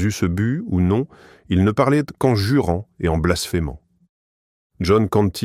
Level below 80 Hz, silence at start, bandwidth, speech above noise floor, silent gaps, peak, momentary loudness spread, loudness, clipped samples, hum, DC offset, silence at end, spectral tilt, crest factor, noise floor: -38 dBFS; 0 s; 16 kHz; over 71 dB; 4.09-4.70 s; -2 dBFS; 7 LU; -20 LUFS; under 0.1%; none; under 0.1%; 0 s; -6.5 dB/octave; 18 dB; under -90 dBFS